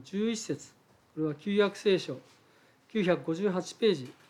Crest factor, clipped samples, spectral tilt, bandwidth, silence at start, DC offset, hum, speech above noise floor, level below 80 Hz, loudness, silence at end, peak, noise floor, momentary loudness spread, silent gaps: 18 dB; under 0.1%; -5.5 dB/octave; 12 kHz; 0 s; under 0.1%; none; 33 dB; -82 dBFS; -31 LUFS; 0.2 s; -14 dBFS; -63 dBFS; 12 LU; none